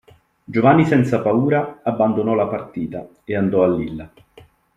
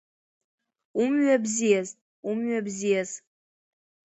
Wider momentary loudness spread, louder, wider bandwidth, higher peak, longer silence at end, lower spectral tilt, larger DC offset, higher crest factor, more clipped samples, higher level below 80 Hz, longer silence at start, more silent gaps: about the same, 14 LU vs 14 LU; first, -18 LUFS vs -26 LUFS; first, 10 kHz vs 8.2 kHz; first, -2 dBFS vs -10 dBFS; second, 0.7 s vs 0.9 s; first, -9 dB/octave vs -4.5 dB/octave; neither; about the same, 16 dB vs 18 dB; neither; first, -54 dBFS vs -74 dBFS; second, 0.5 s vs 0.95 s; second, none vs 2.01-2.23 s